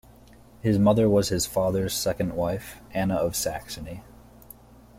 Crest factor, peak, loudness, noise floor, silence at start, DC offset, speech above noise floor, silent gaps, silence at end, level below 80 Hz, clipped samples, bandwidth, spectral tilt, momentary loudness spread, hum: 18 dB; -8 dBFS; -25 LUFS; -51 dBFS; 0.65 s; under 0.1%; 27 dB; none; 0.95 s; -48 dBFS; under 0.1%; 16.5 kHz; -5 dB/octave; 15 LU; none